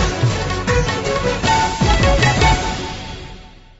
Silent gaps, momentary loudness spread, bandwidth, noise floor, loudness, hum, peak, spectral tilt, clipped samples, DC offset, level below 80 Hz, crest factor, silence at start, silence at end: none; 15 LU; 8 kHz; -38 dBFS; -17 LUFS; none; -4 dBFS; -4.5 dB/octave; under 0.1%; under 0.1%; -24 dBFS; 14 dB; 0 s; 0.3 s